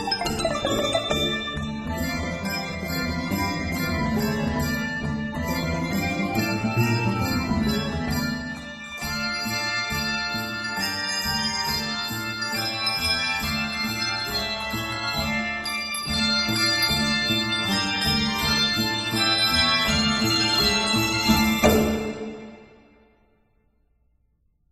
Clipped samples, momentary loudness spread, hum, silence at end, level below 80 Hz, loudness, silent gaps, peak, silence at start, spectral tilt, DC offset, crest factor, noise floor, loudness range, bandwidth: under 0.1%; 9 LU; none; 2.05 s; -40 dBFS; -23 LUFS; none; -4 dBFS; 0 s; -3.5 dB/octave; under 0.1%; 20 dB; -66 dBFS; 6 LU; 16 kHz